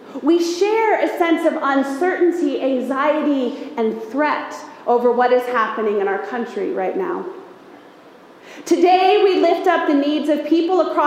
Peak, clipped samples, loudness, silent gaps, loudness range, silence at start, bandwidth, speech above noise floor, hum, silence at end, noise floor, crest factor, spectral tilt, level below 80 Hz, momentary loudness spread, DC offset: -2 dBFS; under 0.1%; -18 LUFS; none; 4 LU; 0 s; 15 kHz; 27 dB; none; 0 s; -44 dBFS; 16 dB; -4.5 dB/octave; -72 dBFS; 10 LU; under 0.1%